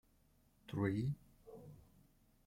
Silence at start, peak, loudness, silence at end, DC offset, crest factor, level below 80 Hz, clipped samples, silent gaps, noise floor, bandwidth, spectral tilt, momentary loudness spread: 0.7 s; -24 dBFS; -42 LUFS; 0.65 s; under 0.1%; 22 dB; -68 dBFS; under 0.1%; none; -73 dBFS; 16.5 kHz; -8.5 dB/octave; 22 LU